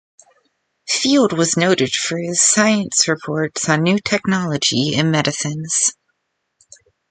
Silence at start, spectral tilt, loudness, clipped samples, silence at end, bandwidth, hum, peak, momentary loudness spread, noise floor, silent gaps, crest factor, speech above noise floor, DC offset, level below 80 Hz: 0.85 s; -3 dB/octave; -16 LUFS; under 0.1%; 1.2 s; 9.6 kHz; none; 0 dBFS; 6 LU; -72 dBFS; none; 18 dB; 55 dB; under 0.1%; -58 dBFS